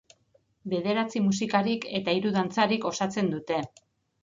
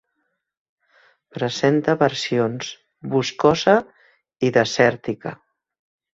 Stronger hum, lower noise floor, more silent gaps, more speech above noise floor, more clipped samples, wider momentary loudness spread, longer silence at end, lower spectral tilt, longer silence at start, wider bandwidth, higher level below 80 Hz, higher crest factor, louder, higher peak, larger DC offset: neither; second, -67 dBFS vs -74 dBFS; neither; second, 40 dB vs 55 dB; neither; second, 6 LU vs 14 LU; second, 0.55 s vs 0.8 s; about the same, -5 dB/octave vs -5 dB/octave; second, 0.65 s vs 1.35 s; about the same, 7.6 kHz vs 7.8 kHz; second, -68 dBFS vs -58 dBFS; about the same, 20 dB vs 20 dB; second, -27 LUFS vs -20 LUFS; second, -8 dBFS vs -2 dBFS; neither